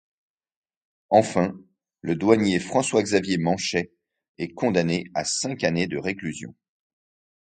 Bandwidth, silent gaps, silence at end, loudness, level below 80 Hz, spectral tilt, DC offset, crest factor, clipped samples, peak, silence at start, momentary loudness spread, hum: 9.4 kHz; 4.29-4.35 s; 0.95 s; -23 LUFS; -58 dBFS; -4.5 dB/octave; under 0.1%; 22 dB; under 0.1%; -2 dBFS; 1.1 s; 14 LU; none